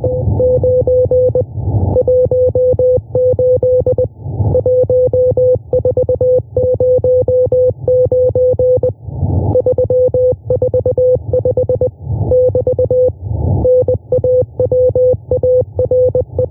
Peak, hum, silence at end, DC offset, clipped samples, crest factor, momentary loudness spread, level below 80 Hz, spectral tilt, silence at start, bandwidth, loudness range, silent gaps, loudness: -4 dBFS; none; 0 s; under 0.1%; under 0.1%; 8 dB; 4 LU; -30 dBFS; -14.5 dB/octave; 0 s; 1.2 kHz; 1 LU; none; -13 LUFS